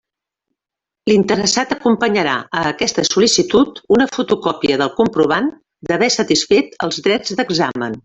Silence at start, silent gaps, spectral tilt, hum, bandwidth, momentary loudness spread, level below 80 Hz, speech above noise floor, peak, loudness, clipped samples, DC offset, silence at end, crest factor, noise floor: 1.05 s; none; -3.5 dB/octave; none; 8.4 kHz; 6 LU; -52 dBFS; 70 dB; -2 dBFS; -16 LUFS; under 0.1%; under 0.1%; 0.05 s; 16 dB; -86 dBFS